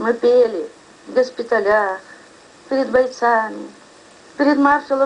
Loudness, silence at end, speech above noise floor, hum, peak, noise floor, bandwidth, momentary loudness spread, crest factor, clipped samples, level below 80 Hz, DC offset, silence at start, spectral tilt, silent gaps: -17 LUFS; 0 s; 28 dB; none; -4 dBFS; -45 dBFS; 10 kHz; 17 LU; 16 dB; under 0.1%; -58 dBFS; under 0.1%; 0 s; -4.5 dB/octave; none